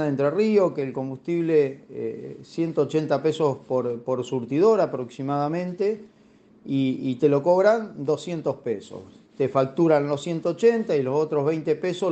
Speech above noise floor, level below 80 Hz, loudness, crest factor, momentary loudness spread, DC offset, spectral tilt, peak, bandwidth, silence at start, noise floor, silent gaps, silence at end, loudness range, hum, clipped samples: 32 dB; -70 dBFS; -24 LUFS; 18 dB; 11 LU; under 0.1%; -7.5 dB/octave; -6 dBFS; 8.4 kHz; 0 s; -55 dBFS; none; 0 s; 2 LU; none; under 0.1%